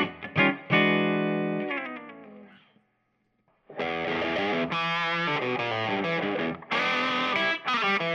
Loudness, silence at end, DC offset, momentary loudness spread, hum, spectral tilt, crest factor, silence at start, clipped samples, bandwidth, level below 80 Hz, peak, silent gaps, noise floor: -26 LUFS; 0 s; under 0.1%; 9 LU; none; -5.5 dB/octave; 20 dB; 0 s; under 0.1%; 8.4 kHz; -70 dBFS; -8 dBFS; none; -73 dBFS